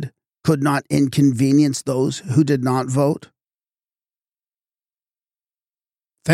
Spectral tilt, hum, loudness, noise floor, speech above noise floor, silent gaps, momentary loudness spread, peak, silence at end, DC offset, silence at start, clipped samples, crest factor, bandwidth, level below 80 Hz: -6.5 dB/octave; none; -18 LUFS; under -90 dBFS; over 73 dB; none; 8 LU; -4 dBFS; 0 s; under 0.1%; 0 s; under 0.1%; 18 dB; 15 kHz; -58 dBFS